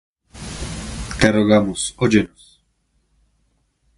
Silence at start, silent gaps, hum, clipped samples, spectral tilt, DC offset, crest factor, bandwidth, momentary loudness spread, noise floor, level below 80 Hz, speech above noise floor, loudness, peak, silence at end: 0.35 s; none; none; under 0.1%; -5 dB/octave; under 0.1%; 22 dB; 11.5 kHz; 15 LU; -66 dBFS; -38 dBFS; 49 dB; -19 LUFS; 0 dBFS; 1.7 s